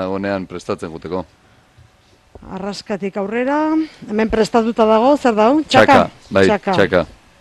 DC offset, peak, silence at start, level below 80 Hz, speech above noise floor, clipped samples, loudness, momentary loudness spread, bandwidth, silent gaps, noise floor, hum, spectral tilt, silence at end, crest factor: under 0.1%; 0 dBFS; 0 s; -44 dBFS; 36 dB; under 0.1%; -16 LUFS; 15 LU; 12.5 kHz; none; -52 dBFS; none; -5.5 dB/octave; 0.3 s; 16 dB